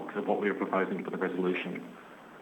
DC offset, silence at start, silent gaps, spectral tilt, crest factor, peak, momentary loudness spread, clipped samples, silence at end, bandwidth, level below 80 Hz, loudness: under 0.1%; 0 s; none; -7.5 dB/octave; 18 dB; -14 dBFS; 17 LU; under 0.1%; 0 s; 18 kHz; -82 dBFS; -32 LUFS